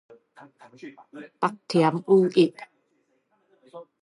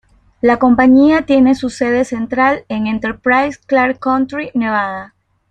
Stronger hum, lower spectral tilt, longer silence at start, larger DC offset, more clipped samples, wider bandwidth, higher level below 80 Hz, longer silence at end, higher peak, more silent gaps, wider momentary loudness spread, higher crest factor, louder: neither; about the same, -7 dB/octave vs -6 dB/octave; first, 0.85 s vs 0.45 s; neither; neither; first, 11 kHz vs 9 kHz; second, -80 dBFS vs -46 dBFS; second, 0.2 s vs 0.45 s; second, -8 dBFS vs -2 dBFS; neither; first, 26 LU vs 9 LU; first, 20 dB vs 12 dB; second, -22 LUFS vs -14 LUFS